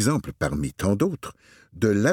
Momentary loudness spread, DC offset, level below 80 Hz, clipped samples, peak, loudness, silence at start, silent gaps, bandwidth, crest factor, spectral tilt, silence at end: 9 LU; under 0.1%; -44 dBFS; under 0.1%; -6 dBFS; -25 LUFS; 0 s; none; 18 kHz; 18 dB; -6 dB/octave; 0 s